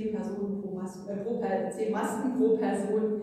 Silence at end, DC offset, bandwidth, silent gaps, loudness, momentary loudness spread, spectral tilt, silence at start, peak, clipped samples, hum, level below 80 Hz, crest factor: 0 s; under 0.1%; 14.5 kHz; none; -30 LUFS; 10 LU; -7 dB/octave; 0 s; -16 dBFS; under 0.1%; none; -68 dBFS; 14 dB